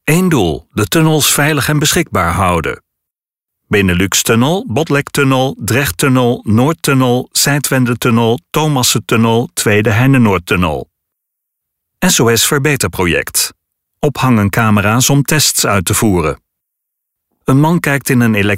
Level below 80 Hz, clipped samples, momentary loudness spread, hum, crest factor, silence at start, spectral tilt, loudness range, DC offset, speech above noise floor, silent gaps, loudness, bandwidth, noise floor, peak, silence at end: -38 dBFS; under 0.1%; 6 LU; none; 12 dB; 0.05 s; -4.5 dB/octave; 2 LU; under 0.1%; 69 dB; none; -12 LUFS; 16.5 kHz; -81 dBFS; 0 dBFS; 0 s